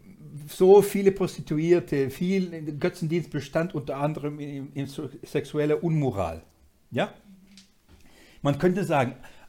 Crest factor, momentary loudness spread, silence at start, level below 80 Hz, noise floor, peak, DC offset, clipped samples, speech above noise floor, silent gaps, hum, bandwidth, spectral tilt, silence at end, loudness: 20 dB; 12 LU; 0.05 s; -56 dBFS; -54 dBFS; -6 dBFS; under 0.1%; under 0.1%; 30 dB; none; none; 17 kHz; -7 dB/octave; 0 s; -26 LUFS